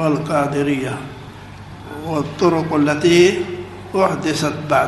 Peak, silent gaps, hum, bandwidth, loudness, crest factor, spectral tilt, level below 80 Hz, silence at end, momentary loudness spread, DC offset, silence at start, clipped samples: -2 dBFS; none; none; 12 kHz; -18 LUFS; 16 dB; -5.5 dB/octave; -48 dBFS; 0 s; 21 LU; under 0.1%; 0 s; under 0.1%